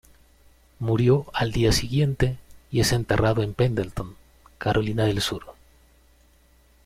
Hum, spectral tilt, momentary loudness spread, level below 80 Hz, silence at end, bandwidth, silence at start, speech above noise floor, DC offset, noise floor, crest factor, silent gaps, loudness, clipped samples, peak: none; -5.5 dB/octave; 11 LU; -40 dBFS; 1.35 s; 15.5 kHz; 0.8 s; 35 dB; under 0.1%; -57 dBFS; 18 dB; none; -24 LUFS; under 0.1%; -6 dBFS